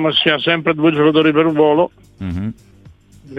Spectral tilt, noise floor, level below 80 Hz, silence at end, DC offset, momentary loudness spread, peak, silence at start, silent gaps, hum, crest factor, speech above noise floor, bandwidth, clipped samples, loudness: -7.5 dB/octave; -44 dBFS; -50 dBFS; 0 s; under 0.1%; 13 LU; 0 dBFS; 0 s; none; none; 16 dB; 29 dB; 5 kHz; under 0.1%; -14 LUFS